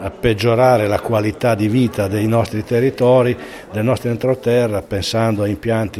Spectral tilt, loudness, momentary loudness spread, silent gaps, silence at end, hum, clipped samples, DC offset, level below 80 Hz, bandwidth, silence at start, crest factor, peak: -6.5 dB/octave; -17 LUFS; 6 LU; none; 0 s; none; under 0.1%; under 0.1%; -42 dBFS; 14.5 kHz; 0 s; 16 dB; 0 dBFS